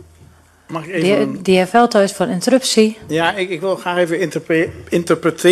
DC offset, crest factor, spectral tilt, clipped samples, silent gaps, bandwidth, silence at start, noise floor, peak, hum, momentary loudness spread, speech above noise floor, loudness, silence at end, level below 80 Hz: under 0.1%; 16 dB; -4.5 dB/octave; under 0.1%; none; 13.5 kHz; 0.7 s; -47 dBFS; 0 dBFS; none; 8 LU; 31 dB; -16 LUFS; 0 s; -52 dBFS